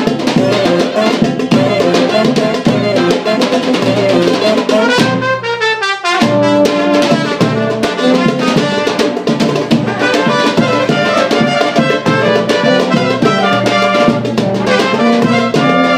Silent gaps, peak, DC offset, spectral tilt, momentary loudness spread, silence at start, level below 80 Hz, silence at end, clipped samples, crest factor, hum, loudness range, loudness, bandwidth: none; 0 dBFS; under 0.1%; -5.5 dB/octave; 3 LU; 0 s; -48 dBFS; 0 s; under 0.1%; 12 dB; none; 1 LU; -11 LUFS; 15.5 kHz